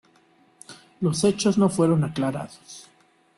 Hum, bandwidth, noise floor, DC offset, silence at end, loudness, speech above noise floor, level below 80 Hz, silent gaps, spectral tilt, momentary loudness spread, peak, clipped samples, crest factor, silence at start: none; 12.5 kHz; -59 dBFS; under 0.1%; 0.55 s; -23 LUFS; 37 dB; -60 dBFS; none; -6 dB/octave; 24 LU; -8 dBFS; under 0.1%; 16 dB; 0.7 s